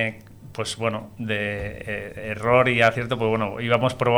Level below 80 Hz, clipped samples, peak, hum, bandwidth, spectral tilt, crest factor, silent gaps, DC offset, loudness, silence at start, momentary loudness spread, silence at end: -48 dBFS; under 0.1%; -4 dBFS; none; 18.5 kHz; -5.5 dB/octave; 18 dB; none; under 0.1%; -23 LUFS; 0 s; 13 LU; 0 s